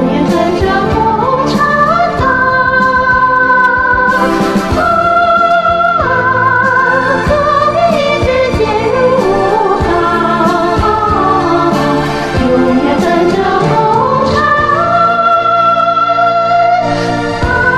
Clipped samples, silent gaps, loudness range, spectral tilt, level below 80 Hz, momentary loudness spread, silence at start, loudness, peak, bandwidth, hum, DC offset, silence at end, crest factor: under 0.1%; none; 2 LU; -6 dB/octave; -30 dBFS; 3 LU; 0 s; -10 LUFS; 0 dBFS; 14 kHz; none; 0.6%; 0 s; 10 dB